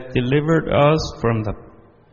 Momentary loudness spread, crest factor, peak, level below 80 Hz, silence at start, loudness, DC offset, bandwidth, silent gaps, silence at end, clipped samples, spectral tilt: 11 LU; 18 dB; -2 dBFS; -38 dBFS; 0 s; -19 LUFS; under 0.1%; 7.2 kHz; none; 0.45 s; under 0.1%; -6 dB/octave